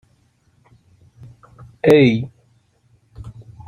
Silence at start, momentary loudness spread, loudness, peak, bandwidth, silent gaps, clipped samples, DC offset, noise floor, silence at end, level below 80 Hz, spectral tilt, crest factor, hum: 1.85 s; 27 LU; -15 LUFS; -2 dBFS; 15 kHz; none; under 0.1%; under 0.1%; -59 dBFS; 0.4 s; -52 dBFS; -7.5 dB/octave; 20 dB; none